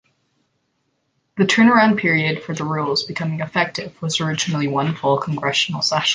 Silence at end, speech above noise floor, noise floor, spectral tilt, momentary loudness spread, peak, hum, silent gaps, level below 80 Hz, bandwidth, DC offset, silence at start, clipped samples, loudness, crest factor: 0 s; 51 dB; -69 dBFS; -4.5 dB/octave; 11 LU; -2 dBFS; none; none; -60 dBFS; 9.8 kHz; under 0.1%; 1.35 s; under 0.1%; -19 LUFS; 18 dB